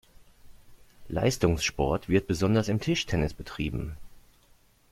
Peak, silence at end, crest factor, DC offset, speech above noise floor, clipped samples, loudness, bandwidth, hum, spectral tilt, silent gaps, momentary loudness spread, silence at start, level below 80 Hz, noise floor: -8 dBFS; 0.7 s; 22 dB; under 0.1%; 34 dB; under 0.1%; -28 LUFS; 16 kHz; none; -5.5 dB/octave; none; 10 LU; 0.2 s; -44 dBFS; -61 dBFS